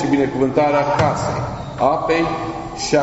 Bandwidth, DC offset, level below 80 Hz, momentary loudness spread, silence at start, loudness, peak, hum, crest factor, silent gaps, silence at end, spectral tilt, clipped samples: 8 kHz; under 0.1%; -40 dBFS; 9 LU; 0 s; -19 LUFS; -2 dBFS; none; 16 dB; none; 0 s; -5 dB/octave; under 0.1%